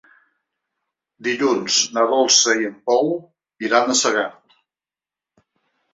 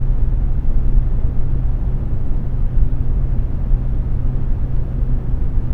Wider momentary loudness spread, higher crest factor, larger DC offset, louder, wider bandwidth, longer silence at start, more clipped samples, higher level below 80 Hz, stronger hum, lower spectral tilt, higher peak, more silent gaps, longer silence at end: first, 14 LU vs 3 LU; first, 20 dB vs 12 dB; neither; first, -18 LUFS vs -22 LUFS; first, 8 kHz vs 2.1 kHz; first, 1.2 s vs 0 s; neither; second, -72 dBFS vs -16 dBFS; neither; second, -1 dB/octave vs -11 dB/octave; about the same, -2 dBFS vs -2 dBFS; neither; first, 1.65 s vs 0 s